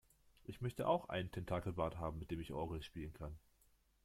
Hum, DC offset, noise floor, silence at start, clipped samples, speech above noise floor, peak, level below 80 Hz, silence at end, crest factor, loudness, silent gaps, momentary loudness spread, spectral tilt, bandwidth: none; under 0.1%; -74 dBFS; 0.5 s; under 0.1%; 32 dB; -24 dBFS; -60 dBFS; 0.65 s; 20 dB; -44 LUFS; none; 14 LU; -7 dB/octave; 16 kHz